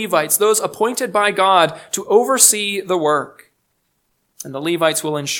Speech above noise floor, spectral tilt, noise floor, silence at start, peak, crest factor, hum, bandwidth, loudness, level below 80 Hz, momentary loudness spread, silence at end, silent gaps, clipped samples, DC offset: 51 dB; -2 dB/octave; -68 dBFS; 0 s; 0 dBFS; 18 dB; none; 19 kHz; -16 LUFS; -70 dBFS; 14 LU; 0 s; none; under 0.1%; under 0.1%